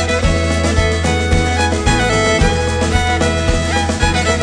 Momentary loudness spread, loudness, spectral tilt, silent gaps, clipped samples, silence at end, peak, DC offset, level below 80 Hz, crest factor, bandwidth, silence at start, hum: 3 LU; -15 LUFS; -4.5 dB/octave; none; under 0.1%; 0 s; 0 dBFS; under 0.1%; -20 dBFS; 14 dB; 10 kHz; 0 s; none